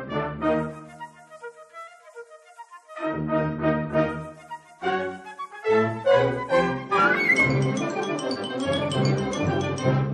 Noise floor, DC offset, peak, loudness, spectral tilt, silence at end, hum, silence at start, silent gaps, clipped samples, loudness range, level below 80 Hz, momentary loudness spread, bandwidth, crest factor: -47 dBFS; under 0.1%; -8 dBFS; -24 LUFS; -6 dB/octave; 0 s; none; 0 s; none; under 0.1%; 9 LU; -50 dBFS; 22 LU; 11.5 kHz; 18 dB